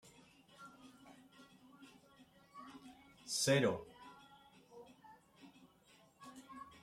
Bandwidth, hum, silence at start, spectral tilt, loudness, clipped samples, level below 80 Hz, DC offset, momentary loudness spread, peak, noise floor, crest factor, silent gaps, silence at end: 15.5 kHz; none; 0.6 s; -4 dB/octave; -36 LUFS; under 0.1%; -80 dBFS; under 0.1%; 29 LU; -22 dBFS; -68 dBFS; 24 dB; none; 0.2 s